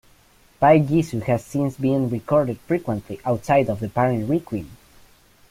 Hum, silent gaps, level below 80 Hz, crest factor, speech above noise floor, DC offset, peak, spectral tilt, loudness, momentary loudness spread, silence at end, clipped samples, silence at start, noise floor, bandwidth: none; none; -52 dBFS; 18 dB; 34 dB; under 0.1%; -2 dBFS; -8 dB/octave; -21 LUFS; 10 LU; 0.75 s; under 0.1%; 0.6 s; -55 dBFS; 16 kHz